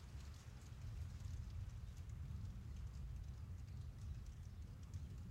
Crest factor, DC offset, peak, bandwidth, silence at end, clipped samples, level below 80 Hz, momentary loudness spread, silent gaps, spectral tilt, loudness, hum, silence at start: 12 dB; under 0.1%; -38 dBFS; 16 kHz; 0 s; under 0.1%; -54 dBFS; 4 LU; none; -6.5 dB/octave; -53 LUFS; none; 0 s